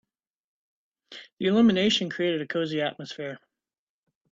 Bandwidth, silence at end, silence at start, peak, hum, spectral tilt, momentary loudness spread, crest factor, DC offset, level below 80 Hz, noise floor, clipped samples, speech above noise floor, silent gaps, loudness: 7.6 kHz; 0.95 s; 1.1 s; -10 dBFS; none; -5 dB/octave; 24 LU; 18 dB; under 0.1%; -66 dBFS; under -90 dBFS; under 0.1%; over 65 dB; 1.33-1.37 s; -25 LUFS